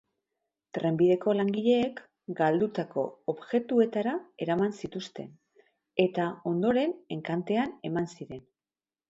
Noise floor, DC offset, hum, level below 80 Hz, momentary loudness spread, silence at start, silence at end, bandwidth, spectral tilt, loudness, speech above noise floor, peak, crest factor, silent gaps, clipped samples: under -90 dBFS; under 0.1%; none; -70 dBFS; 15 LU; 0.75 s; 0.7 s; 7.8 kHz; -7.5 dB/octave; -29 LUFS; over 62 dB; -10 dBFS; 20 dB; none; under 0.1%